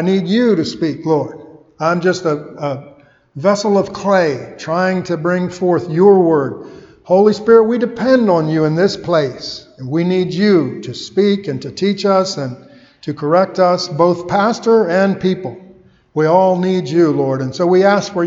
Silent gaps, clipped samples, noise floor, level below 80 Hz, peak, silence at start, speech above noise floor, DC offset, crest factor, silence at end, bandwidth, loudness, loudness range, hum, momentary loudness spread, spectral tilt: none; under 0.1%; -45 dBFS; -56 dBFS; 0 dBFS; 0 s; 31 dB; under 0.1%; 14 dB; 0 s; 7.8 kHz; -15 LUFS; 4 LU; none; 12 LU; -6.5 dB/octave